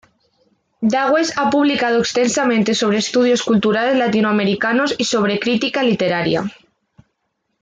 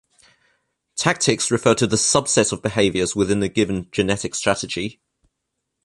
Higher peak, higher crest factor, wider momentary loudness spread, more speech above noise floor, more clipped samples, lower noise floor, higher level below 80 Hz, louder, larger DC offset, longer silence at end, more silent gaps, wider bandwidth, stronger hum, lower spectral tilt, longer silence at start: second, -4 dBFS vs 0 dBFS; second, 12 dB vs 20 dB; second, 3 LU vs 7 LU; about the same, 55 dB vs 58 dB; neither; second, -72 dBFS vs -78 dBFS; second, -58 dBFS vs -48 dBFS; first, -16 LUFS vs -19 LUFS; neither; first, 1.1 s vs 0.95 s; neither; second, 9.4 kHz vs 11.5 kHz; neither; about the same, -4.5 dB/octave vs -3.5 dB/octave; second, 0.8 s vs 0.95 s